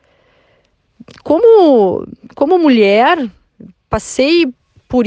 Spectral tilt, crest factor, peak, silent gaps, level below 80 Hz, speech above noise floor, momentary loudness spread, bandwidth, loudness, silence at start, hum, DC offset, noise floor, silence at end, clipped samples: -5 dB/octave; 12 dB; 0 dBFS; none; -44 dBFS; 46 dB; 14 LU; 9.4 kHz; -11 LUFS; 1.25 s; none; under 0.1%; -57 dBFS; 0 s; under 0.1%